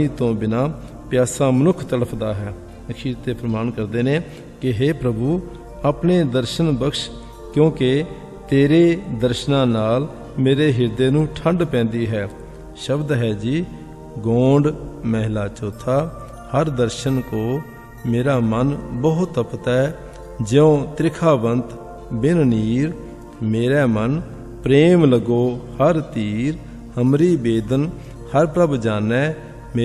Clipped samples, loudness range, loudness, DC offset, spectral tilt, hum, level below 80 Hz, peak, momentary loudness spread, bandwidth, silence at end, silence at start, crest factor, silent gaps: under 0.1%; 4 LU; -19 LUFS; under 0.1%; -7 dB/octave; none; -40 dBFS; -2 dBFS; 14 LU; 13.5 kHz; 0 s; 0 s; 18 dB; none